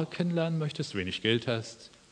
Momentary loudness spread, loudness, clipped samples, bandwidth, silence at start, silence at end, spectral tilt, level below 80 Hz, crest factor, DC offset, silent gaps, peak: 9 LU; -31 LUFS; under 0.1%; 10 kHz; 0 s; 0.25 s; -5.5 dB/octave; -66 dBFS; 18 dB; under 0.1%; none; -12 dBFS